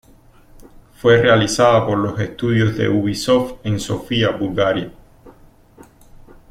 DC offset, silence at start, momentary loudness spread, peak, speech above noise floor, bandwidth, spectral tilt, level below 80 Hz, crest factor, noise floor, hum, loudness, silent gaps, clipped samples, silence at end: under 0.1%; 1.05 s; 9 LU; -2 dBFS; 31 dB; 15 kHz; -5.5 dB/octave; -44 dBFS; 18 dB; -48 dBFS; none; -17 LUFS; none; under 0.1%; 1.2 s